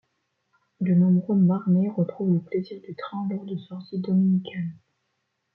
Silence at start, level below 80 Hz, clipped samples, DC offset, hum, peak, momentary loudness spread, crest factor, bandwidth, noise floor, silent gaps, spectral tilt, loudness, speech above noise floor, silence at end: 0.8 s; -72 dBFS; under 0.1%; under 0.1%; none; -12 dBFS; 14 LU; 14 dB; 4.4 kHz; -76 dBFS; none; -12 dB/octave; -24 LUFS; 53 dB; 0.8 s